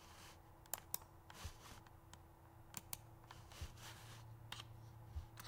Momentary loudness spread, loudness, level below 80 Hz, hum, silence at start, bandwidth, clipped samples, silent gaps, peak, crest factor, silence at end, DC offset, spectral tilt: 14 LU; -54 LUFS; -64 dBFS; none; 0 s; 17 kHz; under 0.1%; none; -22 dBFS; 34 dB; 0 s; under 0.1%; -3 dB/octave